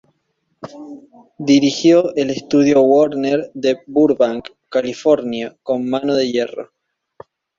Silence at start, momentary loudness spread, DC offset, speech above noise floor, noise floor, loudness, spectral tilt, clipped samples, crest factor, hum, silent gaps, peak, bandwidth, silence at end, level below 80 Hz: 0.65 s; 20 LU; under 0.1%; 52 dB; -68 dBFS; -16 LUFS; -5.5 dB/octave; under 0.1%; 16 dB; none; none; -2 dBFS; 7.6 kHz; 0.95 s; -60 dBFS